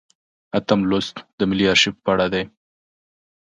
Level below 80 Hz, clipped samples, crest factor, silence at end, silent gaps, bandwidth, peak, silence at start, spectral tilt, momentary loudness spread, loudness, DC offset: -50 dBFS; under 0.1%; 20 dB; 0.95 s; 1.33-1.38 s; 9.4 kHz; -2 dBFS; 0.55 s; -4.5 dB/octave; 11 LU; -19 LUFS; under 0.1%